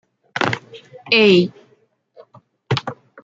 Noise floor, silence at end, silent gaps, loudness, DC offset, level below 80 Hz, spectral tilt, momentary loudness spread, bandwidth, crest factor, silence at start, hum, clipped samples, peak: -59 dBFS; 0.3 s; none; -17 LUFS; under 0.1%; -62 dBFS; -6 dB/octave; 19 LU; 7.8 kHz; 20 dB; 0.35 s; none; under 0.1%; -2 dBFS